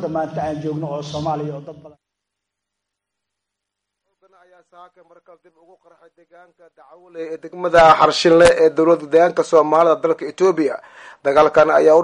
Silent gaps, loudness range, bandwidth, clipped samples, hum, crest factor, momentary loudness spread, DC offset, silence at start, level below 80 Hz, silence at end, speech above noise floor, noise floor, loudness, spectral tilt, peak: none; 18 LU; 11.5 kHz; under 0.1%; 50 Hz at -85 dBFS; 16 dB; 17 LU; under 0.1%; 0 s; -50 dBFS; 0 s; 64 dB; -81 dBFS; -15 LUFS; -5 dB/octave; -2 dBFS